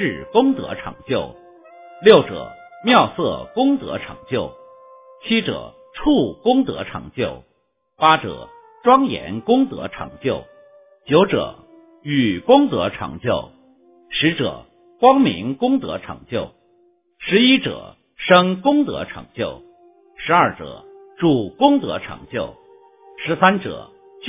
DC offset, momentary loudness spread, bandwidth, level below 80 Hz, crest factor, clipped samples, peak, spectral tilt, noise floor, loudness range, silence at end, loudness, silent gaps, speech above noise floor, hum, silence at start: under 0.1%; 17 LU; 4 kHz; -50 dBFS; 20 dB; under 0.1%; 0 dBFS; -9.5 dB/octave; -64 dBFS; 3 LU; 0 s; -18 LUFS; none; 46 dB; none; 0 s